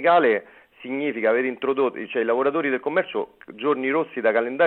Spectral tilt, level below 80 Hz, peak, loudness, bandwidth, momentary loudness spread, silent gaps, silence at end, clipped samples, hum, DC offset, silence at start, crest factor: -8 dB/octave; -74 dBFS; -6 dBFS; -23 LUFS; 4.3 kHz; 7 LU; none; 0 s; under 0.1%; none; under 0.1%; 0 s; 16 dB